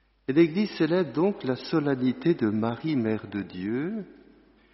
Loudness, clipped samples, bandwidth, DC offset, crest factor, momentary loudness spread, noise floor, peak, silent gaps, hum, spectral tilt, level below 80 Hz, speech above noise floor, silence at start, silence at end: -26 LUFS; under 0.1%; 6 kHz; under 0.1%; 18 dB; 10 LU; -57 dBFS; -8 dBFS; none; none; -6.5 dB/octave; -64 dBFS; 31 dB; 0.3 s; 0.6 s